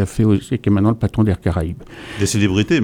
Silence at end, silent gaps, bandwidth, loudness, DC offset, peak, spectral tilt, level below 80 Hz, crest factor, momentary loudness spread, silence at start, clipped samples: 0 s; none; 15 kHz; -18 LUFS; under 0.1%; -2 dBFS; -6 dB/octave; -36 dBFS; 14 dB; 9 LU; 0 s; under 0.1%